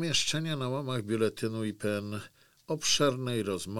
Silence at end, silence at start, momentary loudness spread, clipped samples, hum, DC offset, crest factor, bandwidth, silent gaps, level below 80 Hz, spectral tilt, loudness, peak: 0 s; 0 s; 9 LU; under 0.1%; none; under 0.1%; 18 dB; 19 kHz; none; -60 dBFS; -4 dB/octave; -31 LUFS; -14 dBFS